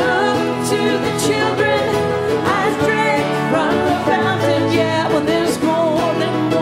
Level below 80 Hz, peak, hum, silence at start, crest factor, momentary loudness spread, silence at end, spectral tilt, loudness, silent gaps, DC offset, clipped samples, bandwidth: -50 dBFS; -2 dBFS; none; 0 s; 14 dB; 2 LU; 0 s; -5 dB/octave; -16 LUFS; none; under 0.1%; under 0.1%; 16 kHz